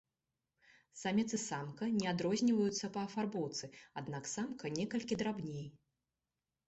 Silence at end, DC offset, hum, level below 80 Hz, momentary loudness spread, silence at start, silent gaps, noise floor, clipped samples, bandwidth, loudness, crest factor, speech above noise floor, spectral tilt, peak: 0.9 s; under 0.1%; none; -74 dBFS; 12 LU; 0.95 s; none; under -90 dBFS; under 0.1%; 8.2 kHz; -38 LUFS; 18 dB; over 52 dB; -5 dB/octave; -20 dBFS